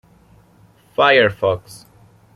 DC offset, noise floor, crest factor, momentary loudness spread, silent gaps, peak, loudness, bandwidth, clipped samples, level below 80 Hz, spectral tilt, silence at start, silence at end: under 0.1%; -51 dBFS; 18 dB; 14 LU; none; -2 dBFS; -16 LUFS; 14 kHz; under 0.1%; -56 dBFS; -5 dB/octave; 1 s; 0.6 s